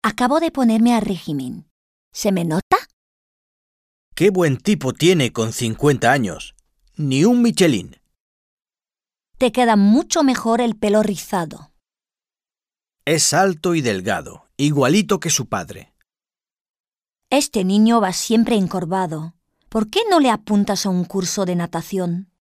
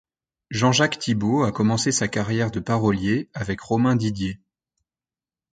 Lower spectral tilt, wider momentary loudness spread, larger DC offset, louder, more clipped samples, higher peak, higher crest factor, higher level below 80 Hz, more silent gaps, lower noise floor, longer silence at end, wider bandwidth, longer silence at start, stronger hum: about the same, -4.5 dB/octave vs -5 dB/octave; first, 12 LU vs 9 LU; neither; first, -18 LUFS vs -22 LUFS; neither; about the same, -2 dBFS vs -4 dBFS; about the same, 18 dB vs 18 dB; about the same, -52 dBFS vs -50 dBFS; first, 1.71-2.11 s, 2.62-2.71 s, 2.93-4.12 s, 8.20-8.57 s, 16.61-16.74 s, 16.80-16.84 s vs none; about the same, under -90 dBFS vs under -90 dBFS; second, 0.15 s vs 1.2 s; first, 15.5 kHz vs 9.4 kHz; second, 0.05 s vs 0.5 s; neither